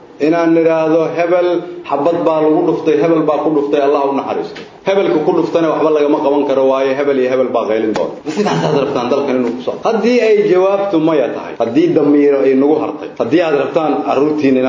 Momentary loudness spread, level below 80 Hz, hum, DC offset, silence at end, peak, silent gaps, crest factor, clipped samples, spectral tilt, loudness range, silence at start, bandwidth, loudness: 7 LU; -58 dBFS; none; under 0.1%; 0 s; 0 dBFS; none; 12 dB; under 0.1%; -7 dB/octave; 2 LU; 0 s; 7.6 kHz; -13 LUFS